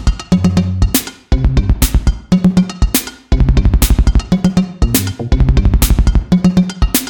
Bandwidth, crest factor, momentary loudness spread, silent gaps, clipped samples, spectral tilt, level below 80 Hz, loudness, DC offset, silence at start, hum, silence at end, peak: 18 kHz; 12 dB; 4 LU; none; under 0.1%; -5.5 dB/octave; -14 dBFS; -14 LUFS; under 0.1%; 0 s; none; 0 s; 0 dBFS